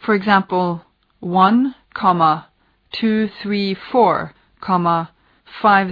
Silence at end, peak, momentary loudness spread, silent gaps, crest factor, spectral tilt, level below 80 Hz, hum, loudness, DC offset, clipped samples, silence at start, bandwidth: 0 s; -2 dBFS; 16 LU; none; 16 dB; -8.5 dB/octave; -58 dBFS; none; -17 LUFS; under 0.1%; under 0.1%; 0 s; 5.2 kHz